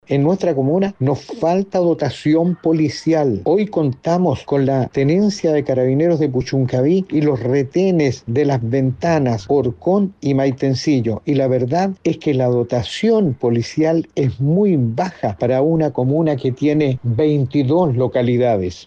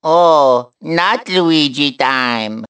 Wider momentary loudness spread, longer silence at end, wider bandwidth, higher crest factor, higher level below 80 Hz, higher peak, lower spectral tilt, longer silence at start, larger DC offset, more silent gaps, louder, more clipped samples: second, 3 LU vs 7 LU; about the same, 0 s vs 0 s; about the same, 8.4 kHz vs 8 kHz; about the same, 10 dB vs 14 dB; first, -50 dBFS vs -62 dBFS; second, -6 dBFS vs 0 dBFS; first, -8 dB/octave vs -5 dB/octave; about the same, 0.1 s vs 0.05 s; neither; neither; second, -17 LUFS vs -13 LUFS; neither